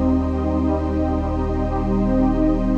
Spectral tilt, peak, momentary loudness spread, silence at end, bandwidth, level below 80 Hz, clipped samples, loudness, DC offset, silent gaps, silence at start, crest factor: -10 dB/octave; -8 dBFS; 4 LU; 0 s; 7 kHz; -26 dBFS; under 0.1%; -21 LUFS; under 0.1%; none; 0 s; 12 dB